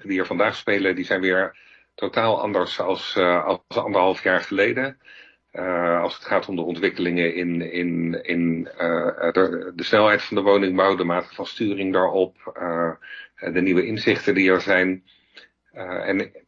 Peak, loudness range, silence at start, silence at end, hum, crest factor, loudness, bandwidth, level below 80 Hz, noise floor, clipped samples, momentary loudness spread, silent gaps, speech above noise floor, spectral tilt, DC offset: -2 dBFS; 3 LU; 0.05 s; 0.1 s; none; 20 dB; -22 LUFS; 7.6 kHz; -64 dBFS; -52 dBFS; under 0.1%; 9 LU; none; 30 dB; -6.5 dB/octave; under 0.1%